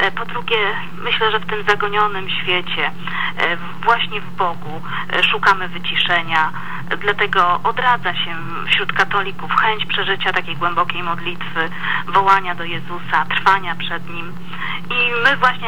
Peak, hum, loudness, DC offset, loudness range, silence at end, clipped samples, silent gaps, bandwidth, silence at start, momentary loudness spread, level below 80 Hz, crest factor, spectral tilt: -2 dBFS; none; -18 LUFS; 7%; 2 LU; 0 s; under 0.1%; none; over 20 kHz; 0 s; 10 LU; -56 dBFS; 18 dB; -4.5 dB/octave